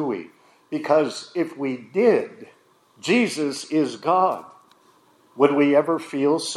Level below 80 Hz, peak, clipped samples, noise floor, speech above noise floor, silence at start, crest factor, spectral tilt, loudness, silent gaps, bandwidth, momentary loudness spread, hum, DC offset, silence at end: -78 dBFS; -2 dBFS; under 0.1%; -57 dBFS; 36 dB; 0 s; 20 dB; -5 dB/octave; -22 LUFS; none; 12.5 kHz; 12 LU; none; under 0.1%; 0 s